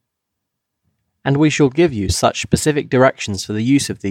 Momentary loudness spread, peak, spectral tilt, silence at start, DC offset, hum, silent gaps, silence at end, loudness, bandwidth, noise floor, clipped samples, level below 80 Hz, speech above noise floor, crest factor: 7 LU; -2 dBFS; -5 dB/octave; 1.25 s; under 0.1%; none; none; 0 s; -16 LUFS; 16 kHz; -78 dBFS; under 0.1%; -40 dBFS; 62 dB; 16 dB